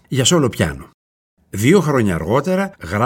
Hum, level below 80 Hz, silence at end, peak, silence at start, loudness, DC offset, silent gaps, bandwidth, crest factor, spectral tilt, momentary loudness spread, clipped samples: none; -42 dBFS; 0 s; 0 dBFS; 0.1 s; -16 LUFS; under 0.1%; 0.94-1.37 s; 17 kHz; 16 dB; -5 dB/octave; 8 LU; under 0.1%